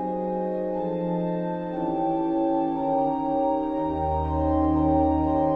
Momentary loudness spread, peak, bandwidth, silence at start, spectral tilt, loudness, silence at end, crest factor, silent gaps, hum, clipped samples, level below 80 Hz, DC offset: 6 LU; -12 dBFS; 4.6 kHz; 0 s; -11 dB/octave; -25 LUFS; 0 s; 14 dB; none; none; under 0.1%; -38 dBFS; under 0.1%